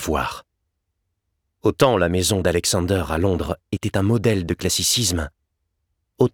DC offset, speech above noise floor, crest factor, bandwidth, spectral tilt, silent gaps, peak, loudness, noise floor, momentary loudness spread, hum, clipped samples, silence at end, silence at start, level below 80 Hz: under 0.1%; 55 dB; 18 dB; 19.5 kHz; -4.5 dB/octave; none; -4 dBFS; -20 LUFS; -75 dBFS; 9 LU; none; under 0.1%; 0.05 s; 0 s; -40 dBFS